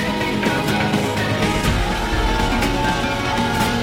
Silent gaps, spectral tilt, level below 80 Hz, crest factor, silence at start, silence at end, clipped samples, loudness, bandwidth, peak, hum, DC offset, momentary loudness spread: none; -5 dB/octave; -28 dBFS; 14 dB; 0 s; 0 s; under 0.1%; -19 LUFS; 16.5 kHz; -6 dBFS; none; under 0.1%; 2 LU